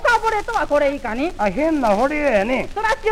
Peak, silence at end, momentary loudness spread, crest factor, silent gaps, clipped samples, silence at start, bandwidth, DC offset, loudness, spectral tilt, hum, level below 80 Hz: -6 dBFS; 0 s; 4 LU; 14 dB; none; under 0.1%; 0 s; 15 kHz; under 0.1%; -19 LUFS; -5 dB/octave; none; -34 dBFS